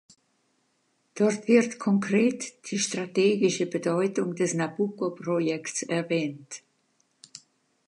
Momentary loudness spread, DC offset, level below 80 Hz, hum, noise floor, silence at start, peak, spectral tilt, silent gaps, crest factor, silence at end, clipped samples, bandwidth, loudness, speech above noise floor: 19 LU; under 0.1%; -80 dBFS; none; -71 dBFS; 1.15 s; -8 dBFS; -5 dB/octave; none; 20 dB; 0.5 s; under 0.1%; 11 kHz; -26 LUFS; 46 dB